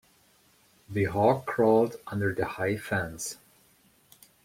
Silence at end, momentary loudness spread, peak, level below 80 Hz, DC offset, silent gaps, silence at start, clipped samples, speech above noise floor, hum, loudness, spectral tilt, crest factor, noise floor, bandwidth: 1.1 s; 13 LU; -8 dBFS; -60 dBFS; under 0.1%; none; 0.9 s; under 0.1%; 36 dB; none; -28 LUFS; -6 dB/octave; 20 dB; -63 dBFS; 16.5 kHz